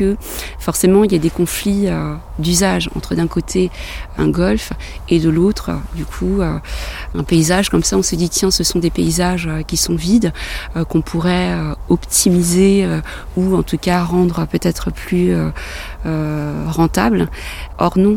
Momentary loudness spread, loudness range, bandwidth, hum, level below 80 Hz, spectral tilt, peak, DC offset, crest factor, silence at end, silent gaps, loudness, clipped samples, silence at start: 11 LU; 3 LU; 17.5 kHz; none; -28 dBFS; -5 dB/octave; 0 dBFS; 0.1%; 16 dB; 0 s; none; -16 LUFS; under 0.1%; 0 s